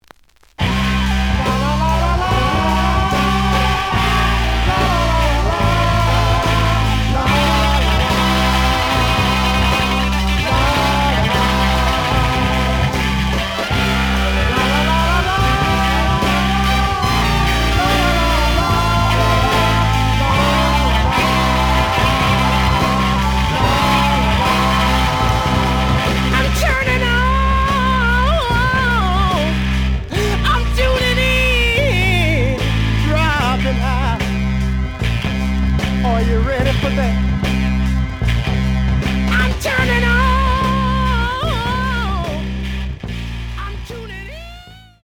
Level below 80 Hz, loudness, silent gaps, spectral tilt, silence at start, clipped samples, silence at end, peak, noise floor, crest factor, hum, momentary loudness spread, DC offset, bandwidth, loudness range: -20 dBFS; -16 LUFS; none; -5 dB/octave; 0.6 s; under 0.1%; 0.25 s; -2 dBFS; -47 dBFS; 14 dB; none; 5 LU; under 0.1%; 18.5 kHz; 3 LU